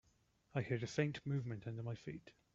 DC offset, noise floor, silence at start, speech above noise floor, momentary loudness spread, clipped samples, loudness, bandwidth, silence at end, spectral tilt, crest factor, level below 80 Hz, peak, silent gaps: under 0.1%; -76 dBFS; 0.55 s; 34 dB; 10 LU; under 0.1%; -43 LUFS; 7.6 kHz; 0.25 s; -6.5 dB/octave; 22 dB; -72 dBFS; -22 dBFS; none